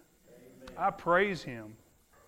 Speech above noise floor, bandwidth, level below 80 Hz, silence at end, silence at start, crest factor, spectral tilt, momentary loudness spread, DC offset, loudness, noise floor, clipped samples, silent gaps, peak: 27 dB; 16 kHz; -62 dBFS; 0.5 s; 0.6 s; 20 dB; -5.5 dB/octave; 23 LU; under 0.1%; -30 LUFS; -58 dBFS; under 0.1%; none; -14 dBFS